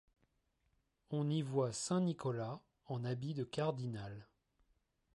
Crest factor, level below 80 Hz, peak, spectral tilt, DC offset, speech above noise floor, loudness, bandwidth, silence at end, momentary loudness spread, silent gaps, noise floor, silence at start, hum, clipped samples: 18 dB; -74 dBFS; -24 dBFS; -6 dB/octave; under 0.1%; 42 dB; -40 LUFS; 11.5 kHz; 0.9 s; 11 LU; none; -80 dBFS; 1.1 s; none; under 0.1%